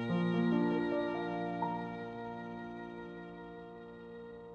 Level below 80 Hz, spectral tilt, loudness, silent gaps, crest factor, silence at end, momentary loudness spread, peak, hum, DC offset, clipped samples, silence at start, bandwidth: -68 dBFS; -8.5 dB/octave; -37 LUFS; none; 16 dB; 0 s; 18 LU; -20 dBFS; none; under 0.1%; under 0.1%; 0 s; 6.8 kHz